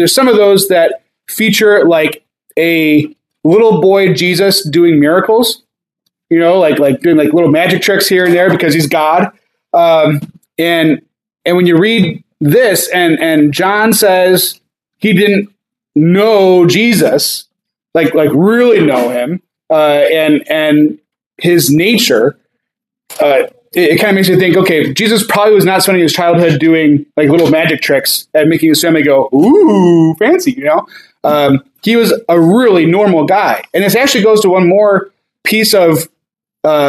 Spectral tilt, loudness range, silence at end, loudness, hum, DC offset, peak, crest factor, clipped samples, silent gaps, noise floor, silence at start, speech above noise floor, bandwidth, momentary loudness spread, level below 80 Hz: -5 dB/octave; 2 LU; 0 s; -9 LUFS; none; under 0.1%; 0 dBFS; 10 dB; under 0.1%; 21.26-21.31 s; -77 dBFS; 0 s; 69 dB; 16 kHz; 8 LU; -56 dBFS